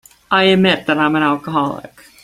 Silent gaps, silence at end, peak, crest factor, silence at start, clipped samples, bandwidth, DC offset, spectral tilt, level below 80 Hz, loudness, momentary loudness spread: none; 0.35 s; 0 dBFS; 16 dB; 0.3 s; under 0.1%; 14 kHz; under 0.1%; -6 dB/octave; -54 dBFS; -15 LUFS; 9 LU